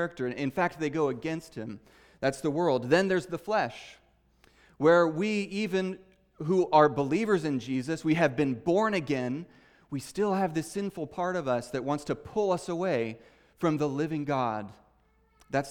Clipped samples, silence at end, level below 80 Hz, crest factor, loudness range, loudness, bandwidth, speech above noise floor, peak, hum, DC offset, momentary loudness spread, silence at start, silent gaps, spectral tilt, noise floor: under 0.1%; 0 s; -64 dBFS; 22 dB; 5 LU; -29 LUFS; 17.5 kHz; 38 dB; -8 dBFS; none; under 0.1%; 13 LU; 0 s; none; -6 dB/octave; -66 dBFS